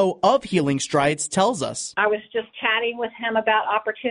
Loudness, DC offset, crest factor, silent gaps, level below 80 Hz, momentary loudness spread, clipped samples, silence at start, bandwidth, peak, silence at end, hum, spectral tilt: -22 LUFS; under 0.1%; 16 dB; none; -60 dBFS; 6 LU; under 0.1%; 0 s; 10.5 kHz; -6 dBFS; 0 s; none; -4 dB/octave